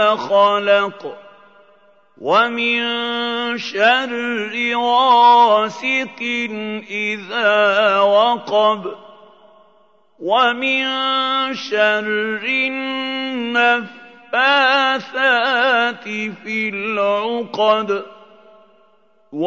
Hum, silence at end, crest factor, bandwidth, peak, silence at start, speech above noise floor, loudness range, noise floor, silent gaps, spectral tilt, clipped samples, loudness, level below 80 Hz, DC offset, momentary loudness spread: none; 0 s; 18 dB; 7.6 kHz; 0 dBFS; 0 s; 40 dB; 4 LU; -57 dBFS; none; -3.5 dB/octave; under 0.1%; -16 LUFS; -74 dBFS; 0.1%; 10 LU